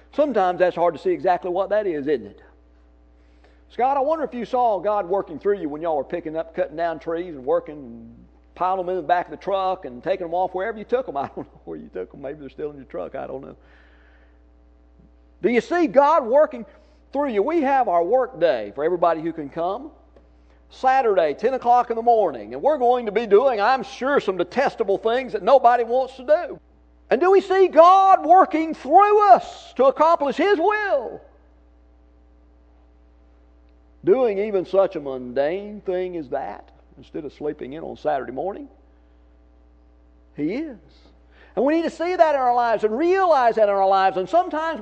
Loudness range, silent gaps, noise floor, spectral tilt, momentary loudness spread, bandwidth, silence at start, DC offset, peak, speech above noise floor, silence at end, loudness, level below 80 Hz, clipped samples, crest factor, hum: 14 LU; none; -53 dBFS; -6 dB/octave; 17 LU; 8.4 kHz; 0.15 s; under 0.1%; 0 dBFS; 32 dB; 0 s; -20 LUFS; -54 dBFS; under 0.1%; 20 dB; none